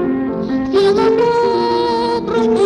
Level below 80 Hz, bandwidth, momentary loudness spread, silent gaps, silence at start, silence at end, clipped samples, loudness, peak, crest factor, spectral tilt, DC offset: -44 dBFS; 10.5 kHz; 6 LU; none; 0 s; 0 s; under 0.1%; -15 LUFS; -4 dBFS; 10 dB; -6 dB/octave; under 0.1%